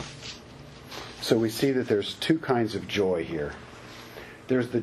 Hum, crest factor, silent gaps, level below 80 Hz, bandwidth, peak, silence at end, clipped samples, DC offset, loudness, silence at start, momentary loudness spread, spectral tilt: none; 20 dB; none; -56 dBFS; 13 kHz; -8 dBFS; 0 s; under 0.1%; under 0.1%; -27 LUFS; 0 s; 19 LU; -5.5 dB/octave